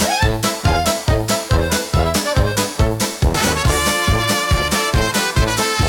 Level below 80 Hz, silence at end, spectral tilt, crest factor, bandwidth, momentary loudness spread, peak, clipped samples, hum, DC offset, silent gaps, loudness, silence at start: -24 dBFS; 0 s; -4 dB/octave; 14 dB; 18 kHz; 2 LU; -4 dBFS; under 0.1%; none; under 0.1%; none; -17 LUFS; 0 s